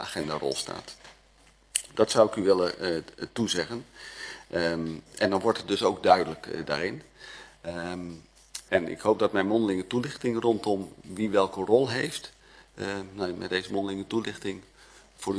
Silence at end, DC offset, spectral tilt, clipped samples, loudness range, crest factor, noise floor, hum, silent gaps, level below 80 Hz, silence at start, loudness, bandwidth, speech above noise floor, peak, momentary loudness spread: 0 s; under 0.1%; -4.5 dB/octave; under 0.1%; 3 LU; 26 dB; -59 dBFS; none; none; -60 dBFS; 0 s; -28 LUFS; 11 kHz; 32 dB; -4 dBFS; 17 LU